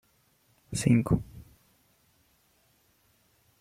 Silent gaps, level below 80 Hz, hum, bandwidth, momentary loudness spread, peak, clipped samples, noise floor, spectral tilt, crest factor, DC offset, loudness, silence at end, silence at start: none; -50 dBFS; none; 15.5 kHz; 24 LU; -10 dBFS; under 0.1%; -68 dBFS; -6.5 dB/octave; 22 dB; under 0.1%; -27 LUFS; 2.2 s; 0.7 s